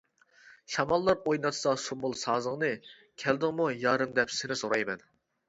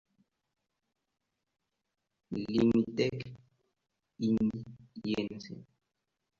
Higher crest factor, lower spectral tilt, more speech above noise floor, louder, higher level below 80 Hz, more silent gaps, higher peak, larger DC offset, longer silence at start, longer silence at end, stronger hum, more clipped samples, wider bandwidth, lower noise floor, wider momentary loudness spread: about the same, 20 dB vs 20 dB; second, -4 dB/octave vs -7 dB/octave; second, 29 dB vs 54 dB; about the same, -30 LUFS vs -32 LUFS; about the same, -64 dBFS vs -64 dBFS; neither; first, -10 dBFS vs -16 dBFS; neither; second, 0.45 s vs 2.3 s; second, 0.5 s vs 0.75 s; neither; neither; first, 8 kHz vs 7.2 kHz; second, -59 dBFS vs -85 dBFS; second, 8 LU vs 20 LU